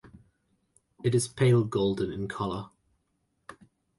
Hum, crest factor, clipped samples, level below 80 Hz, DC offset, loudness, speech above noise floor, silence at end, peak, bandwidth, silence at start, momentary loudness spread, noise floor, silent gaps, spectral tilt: none; 18 dB; under 0.1%; -58 dBFS; under 0.1%; -28 LUFS; 49 dB; 0.45 s; -12 dBFS; 11.5 kHz; 0.15 s; 11 LU; -76 dBFS; none; -6.5 dB/octave